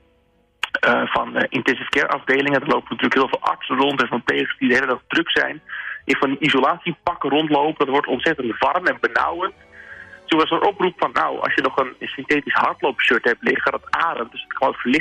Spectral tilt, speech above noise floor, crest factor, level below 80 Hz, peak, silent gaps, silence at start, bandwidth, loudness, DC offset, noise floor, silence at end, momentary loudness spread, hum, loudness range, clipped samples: -5 dB/octave; 41 dB; 14 dB; -58 dBFS; -6 dBFS; none; 0.65 s; 12 kHz; -20 LUFS; under 0.1%; -60 dBFS; 0 s; 8 LU; none; 1 LU; under 0.1%